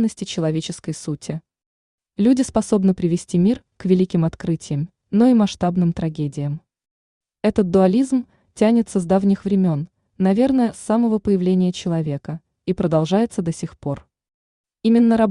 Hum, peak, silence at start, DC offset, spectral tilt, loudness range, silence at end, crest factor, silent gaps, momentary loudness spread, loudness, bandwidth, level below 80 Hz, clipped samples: none; -4 dBFS; 0 s; under 0.1%; -7.5 dB/octave; 3 LU; 0 s; 16 dB; 1.66-1.98 s, 6.91-7.21 s, 14.34-14.64 s; 12 LU; -20 LUFS; 11 kHz; -50 dBFS; under 0.1%